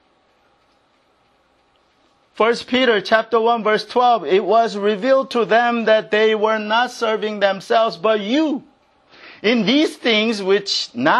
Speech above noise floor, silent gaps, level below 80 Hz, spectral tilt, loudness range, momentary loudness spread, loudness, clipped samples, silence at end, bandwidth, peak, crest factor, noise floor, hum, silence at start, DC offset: 43 dB; none; -68 dBFS; -4 dB/octave; 3 LU; 4 LU; -17 LUFS; under 0.1%; 0 s; 12 kHz; 0 dBFS; 18 dB; -60 dBFS; none; 2.35 s; under 0.1%